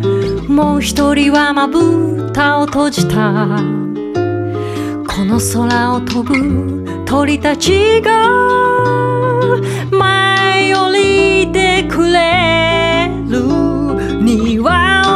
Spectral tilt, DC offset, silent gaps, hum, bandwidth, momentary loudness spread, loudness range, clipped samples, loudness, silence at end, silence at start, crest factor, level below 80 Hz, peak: -5 dB/octave; under 0.1%; none; none; 14.5 kHz; 7 LU; 4 LU; under 0.1%; -12 LUFS; 0 s; 0 s; 12 dB; -32 dBFS; 0 dBFS